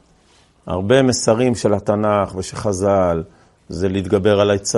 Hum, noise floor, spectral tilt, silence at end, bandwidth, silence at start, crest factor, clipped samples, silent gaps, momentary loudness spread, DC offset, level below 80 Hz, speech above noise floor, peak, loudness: none; -54 dBFS; -5 dB/octave; 0 s; 11.5 kHz; 0.65 s; 18 dB; under 0.1%; none; 10 LU; under 0.1%; -48 dBFS; 37 dB; 0 dBFS; -17 LUFS